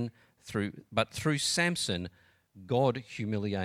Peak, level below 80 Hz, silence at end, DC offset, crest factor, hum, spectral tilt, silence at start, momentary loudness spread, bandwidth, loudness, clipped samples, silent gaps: -10 dBFS; -64 dBFS; 0 s; under 0.1%; 22 dB; none; -4 dB/octave; 0 s; 9 LU; 16 kHz; -31 LUFS; under 0.1%; none